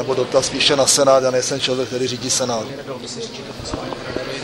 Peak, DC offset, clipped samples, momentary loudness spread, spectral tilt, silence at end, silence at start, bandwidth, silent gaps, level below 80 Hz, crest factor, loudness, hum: -2 dBFS; under 0.1%; under 0.1%; 16 LU; -2.5 dB/octave; 0 s; 0 s; 16 kHz; none; -48 dBFS; 18 dB; -18 LUFS; none